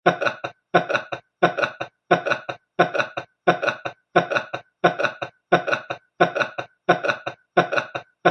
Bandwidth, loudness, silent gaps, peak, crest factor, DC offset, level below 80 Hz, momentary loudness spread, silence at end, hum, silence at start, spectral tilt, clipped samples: 9 kHz; -23 LUFS; none; 0 dBFS; 22 dB; under 0.1%; -68 dBFS; 11 LU; 0 s; none; 0.05 s; -5.5 dB/octave; under 0.1%